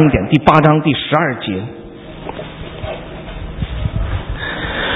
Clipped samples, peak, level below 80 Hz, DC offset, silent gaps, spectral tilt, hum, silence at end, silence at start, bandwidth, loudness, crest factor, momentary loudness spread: under 0.1%; 0 dBFS; -28 dBFS; under 0.1%; none; -8.5 dB/octave; none; 0 s; 0 s; 6 kHz; -16 LUFS; 16 dB; 19 LU